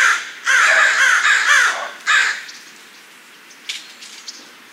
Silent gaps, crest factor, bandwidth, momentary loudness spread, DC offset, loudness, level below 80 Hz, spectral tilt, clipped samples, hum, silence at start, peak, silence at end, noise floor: none; 16 dB; 16 kHz; 22 LU; under 0.1%; -13 LUFS; -76 dBFS; 3.5 dB/octave; under 0.1%; none; 0 s; -2 dBFS; 0.3 s; -43 dBFS